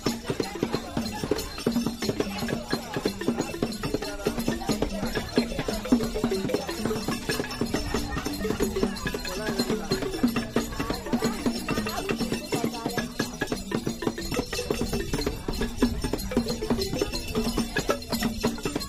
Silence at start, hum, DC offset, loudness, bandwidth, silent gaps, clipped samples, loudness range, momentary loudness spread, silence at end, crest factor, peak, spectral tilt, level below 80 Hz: 0 s; none; under 0.1%; -29 LUFS; 15.5 kHz; none; under 0.1%; 1 LU; 4 LU; 0 s; 20 dB; -8 dBFS; -4.5 dB/octave; -40 dBFS